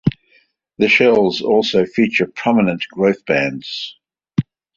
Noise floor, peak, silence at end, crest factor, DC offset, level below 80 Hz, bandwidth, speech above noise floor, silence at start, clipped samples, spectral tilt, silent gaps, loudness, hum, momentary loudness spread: -57 dBFS; -2 dBFS; 0.35 s; 16 dB; under 0.1%; -52 dBFS; 7.6 kHz; 41 dB; 0.05 s; under 0.1%; -6 dB/octave; none; -16 LUFS; none; 12 LU